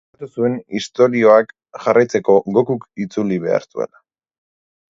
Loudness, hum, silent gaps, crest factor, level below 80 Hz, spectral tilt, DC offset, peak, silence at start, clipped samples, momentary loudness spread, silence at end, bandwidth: -17 LUFS; none; none; 18 dB; -62 dBFS; -6.5 dB/octave; under 0.1%; 0 dBFS; 0.2 s; under 0.1%; 15 LU; 1.1 s; 7.8 kHz